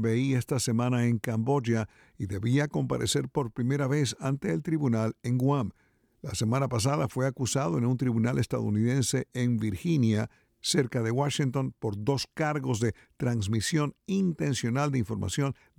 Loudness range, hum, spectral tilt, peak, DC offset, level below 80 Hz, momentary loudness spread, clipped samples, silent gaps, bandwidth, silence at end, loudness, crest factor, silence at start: 2 LU; none; -5.5 dB/octave; -12 dBFS; under 0.1%; -58 dBFS; 5 LU; under 0.1%; none; 16 kHz; 0.25 s; -29 LUFS; 16 dB; 0 s